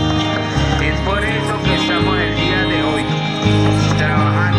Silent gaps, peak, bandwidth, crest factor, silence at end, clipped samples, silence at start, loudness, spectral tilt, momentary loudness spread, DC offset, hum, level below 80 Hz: none; 0 dBFS; 11 kHz; 14 dB; 0 s; under 0.1%; 0 s; -16 LUFS; -6 dB/octave; 3 LU; under 0.1%; none; -28 dBFS